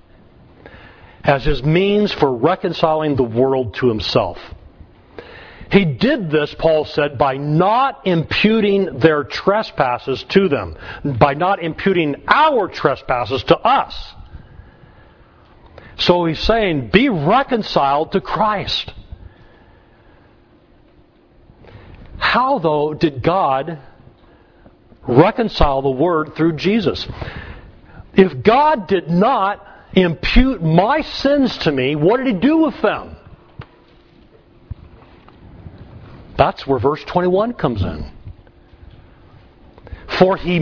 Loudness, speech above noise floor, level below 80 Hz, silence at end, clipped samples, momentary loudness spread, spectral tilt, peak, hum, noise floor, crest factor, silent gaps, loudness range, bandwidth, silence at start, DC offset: -16 LUFS; 34 dB; -34 dBFS; 0 s; under 0.1%; 11 LU; -7.5 dB/octave; 0 dBFS; none; -50 dBFS; 18 dB; none; 6 LU; 5.4 kHz; 0.75 s; under 0.1%